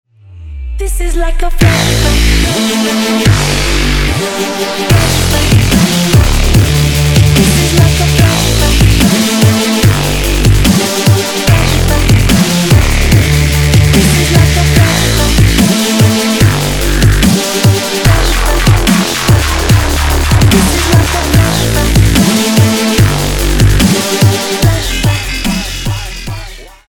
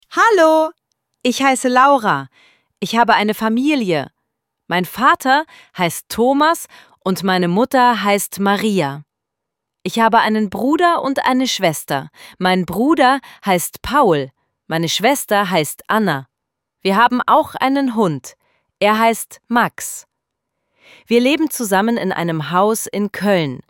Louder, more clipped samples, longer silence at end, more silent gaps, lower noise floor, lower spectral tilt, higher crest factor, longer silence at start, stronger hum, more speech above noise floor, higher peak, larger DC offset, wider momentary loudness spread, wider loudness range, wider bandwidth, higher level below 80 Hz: first, -9 LUFS vs -16 LUFS; first, 0.3% vs under 0.1%; about the same, 0.2 s vs 0.1 s; neither; second, -29 dBFS vs -80 dBFS; about the same, -4.5 dB/octave vs -4.5 dB/octave; second, 8 dB vs 16 dB; first, 0.3 s vs 0.1 s; neither; second, 20 dB vs 64 dB; about the same, 0 dBFS vs 0 dBFS; neither; second, 7 LU vs 10 LU; about the same, 2 LU vs 3 LU; first, 20 kHz vs 17.5 kHz; first, -16 dBFS vs -54 dBFS